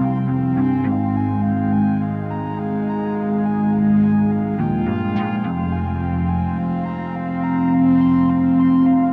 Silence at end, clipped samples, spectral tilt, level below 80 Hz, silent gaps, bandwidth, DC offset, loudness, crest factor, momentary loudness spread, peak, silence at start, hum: 0 s; under 0.1%; -11 dB/octave; -42 dBFS; none; 4.1 kHz; under 0.1%; -19 LUFS; 12 dB; 8 LU; -6 dBFS; 0 s; none